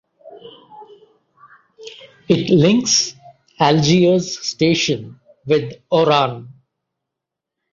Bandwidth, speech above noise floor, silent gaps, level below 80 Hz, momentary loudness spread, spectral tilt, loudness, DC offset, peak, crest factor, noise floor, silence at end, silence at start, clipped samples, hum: 7.6 kHz; 67 dB; none; -56 dBFS; 19 LU; -4.5 dB/octave; -16 LUFS; under 0.1%; -2 dBFS; 18 dB; -83 dBFS; 1.2 s; 0.25 s; under 0.1%; none